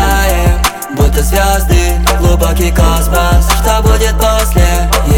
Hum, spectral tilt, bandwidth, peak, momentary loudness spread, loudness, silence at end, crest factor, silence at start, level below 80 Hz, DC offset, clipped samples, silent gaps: none; -4.5 dB/octave; 18.5 kHz; 0 dBFS; 2 LU; -11 LUFS; 0 s; 8 dB; 0 s; -12 dBFS; under 0.1%; under 0.1%; none